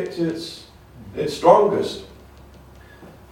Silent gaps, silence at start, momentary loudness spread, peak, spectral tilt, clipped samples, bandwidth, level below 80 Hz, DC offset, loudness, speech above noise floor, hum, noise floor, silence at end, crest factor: none; 0 s; 21 LU; -2 dBFS; -6 dB/octave; under 0.1%; 16.5 kHz; -50 dBFS; under 0.1%; -19 LUFS; 26 dB; none; -45 dBFS; 0.2 s; 22 dB